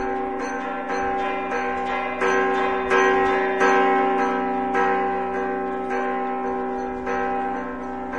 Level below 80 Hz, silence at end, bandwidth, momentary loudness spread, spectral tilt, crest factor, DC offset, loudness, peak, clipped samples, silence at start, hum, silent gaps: -50 dBFS; 0 s; 9.2 kHz; 9 LU; -4.5 dB/octave; 16 dB; 0.7%; -23 LUFS; -6 dBFS; under 0.1%; 0 s; none; none